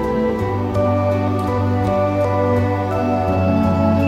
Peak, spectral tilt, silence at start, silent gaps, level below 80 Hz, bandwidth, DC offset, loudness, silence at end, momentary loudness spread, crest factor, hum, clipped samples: -4 dBFS; -9 dB/octave; 0 s; none; -38 dBFS; 8.4 kHz; under 0.1%; -18 LUFS; 0 s; 3 LU; 12 dB; none; under 0.1%